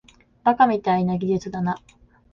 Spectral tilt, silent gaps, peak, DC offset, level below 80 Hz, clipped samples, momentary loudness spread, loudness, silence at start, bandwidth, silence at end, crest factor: -7.5 dB/octave; none; -4 dBFS; under 0.1%; -54 dBFS; under 0.1%; 9 LU; -22 LUFS; 0.45 s; 7.2 kHz; 0.55 s; 20 dB